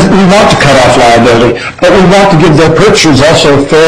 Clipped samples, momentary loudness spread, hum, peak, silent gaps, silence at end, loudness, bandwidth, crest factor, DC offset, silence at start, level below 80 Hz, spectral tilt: 2%; 3 LU; none; 0 dBFS; none; 0 s; -4 LUFS; 15.5 kHz; 4 dB; 4%; 0 s; -26 dBFS; -5 dB/octave